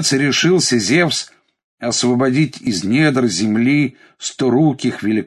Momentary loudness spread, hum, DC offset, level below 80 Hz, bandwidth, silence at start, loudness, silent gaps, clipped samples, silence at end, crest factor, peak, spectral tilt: 9 LU; none; under 0.1%; -54 dBFS; 12.5 kHz; 0 s; -16 LUFS; 1.64-1.78 s; under 0.1%; 0 s; 14 dB; -2 dBFS; -4.5 dB/octave